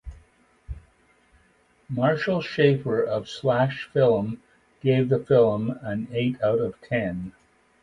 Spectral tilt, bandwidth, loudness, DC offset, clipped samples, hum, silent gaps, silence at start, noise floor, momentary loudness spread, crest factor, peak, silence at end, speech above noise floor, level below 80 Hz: -8 dB/octave; 10.5 kHz; -24 LUFS; under 0.1%; under 0.1%; none; none; 0.05 s; -62 dBFS; 15 LU; 20 dB; -6 dBFS; 0.5 s; 39 dB; -50 dBFS